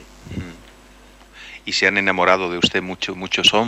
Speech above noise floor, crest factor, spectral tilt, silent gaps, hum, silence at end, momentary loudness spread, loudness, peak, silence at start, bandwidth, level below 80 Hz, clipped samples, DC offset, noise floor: 28 dB; 18 dB; -3 dB/octave; none; 50 Hz at -50 dBFS; 0 s; 18 LU; -18 LUFS; -2 dBFS; 0 s; 16 kHz; -48 dBFS; under 0.1%; under 0.1%; -46 dBFS